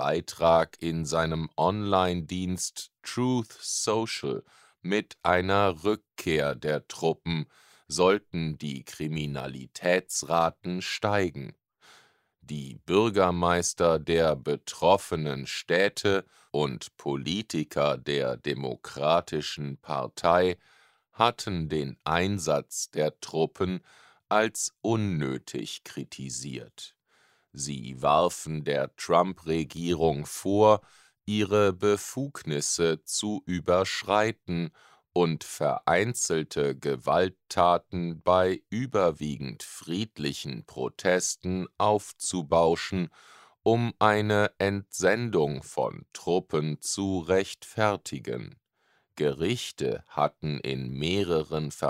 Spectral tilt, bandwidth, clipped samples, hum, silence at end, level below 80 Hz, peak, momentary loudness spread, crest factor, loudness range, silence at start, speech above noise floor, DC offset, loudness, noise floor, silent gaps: -4.5 dB/octave; 16 kHz; under 0.1%; none; 0 s; -56 dBFS; -4 dBFS; 12 LU; 24 dB; 4 LU; 0 s; 43 dB; under 0.1%; -28 LUFS; -71 dBFS; none